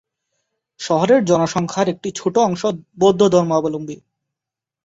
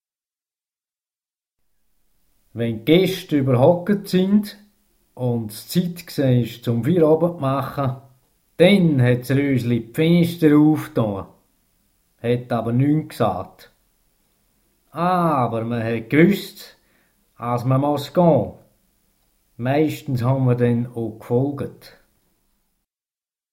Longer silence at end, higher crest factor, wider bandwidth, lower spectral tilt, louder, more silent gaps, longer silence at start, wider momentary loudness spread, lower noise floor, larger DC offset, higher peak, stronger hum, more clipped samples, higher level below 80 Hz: second, 0.9 s vs 1.8 s; about the same, 16 dB vs 20 dB; second, 8 kHz vs 16.5 kHz; second, -5.5 dB/octave vs -7.5 dB/octave; first, -17 LUFS vs -20 LUFS; neither; second, 0.8 s vs 2.55 s; about the same, 13 LU vs 12 LU; second, -86 dBFS vs under -90 dBFS; neither; about the same, -2 dBFS vs 0 dBFS; neither; neither; about the same, -58 dBFS vs -54 dBFS